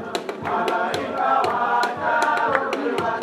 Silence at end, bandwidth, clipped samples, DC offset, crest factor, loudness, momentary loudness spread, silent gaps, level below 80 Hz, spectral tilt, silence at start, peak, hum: 0 s; 15.5 kHz; under 0.1%; under 0.1%; 20 dB; -22 LUFS; 5 LU; none; -66 dBFS; -4 dB/octave; 0 s; -2 dBFS; none